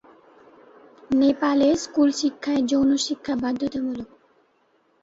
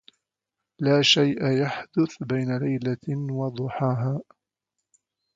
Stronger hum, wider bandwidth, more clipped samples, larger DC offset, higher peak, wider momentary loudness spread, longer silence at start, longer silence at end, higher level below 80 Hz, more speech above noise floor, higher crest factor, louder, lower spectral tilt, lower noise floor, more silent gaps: neither; about the same, 8 kHz vs 7.8 kHz; neither; neither; about the same, -8 dBFS vs -6 dBFS; about the same, 9 LU vs 11 LU; first, 1.1 s vs 0.8 s; second, 1 s vs 1.15 s; first, -58 dBFS vs -66 dBFS; second, 43 dB vs 61 dB; about the same, 16 dB vs 20 dB; about the same, -22 LUFS vs -24 LUFS; second, -4 dB/octave vs -5.5 dB/octave; second, -64 dBFS vs -85 dBFS; neither